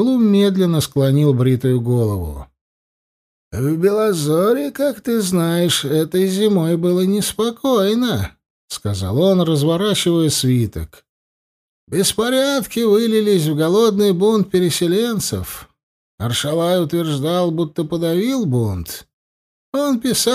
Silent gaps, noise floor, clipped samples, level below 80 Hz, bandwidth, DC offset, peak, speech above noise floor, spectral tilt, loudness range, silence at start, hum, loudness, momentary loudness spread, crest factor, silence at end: 2.61-3.51 s, 8.50-8.68 s, 11.09-11.87 s, 15.83-16.18 s, 19.13-19.72 s; under -90 dBFS; under 0.1%; -44 dBFS; 15.5 kHz; under 0.1%; -4 dBFS; over 74 dB; -5.5 dB/octave; 4 LU; 0 s; none; -17 LUFS; 10 LU; 14 dB; 0 s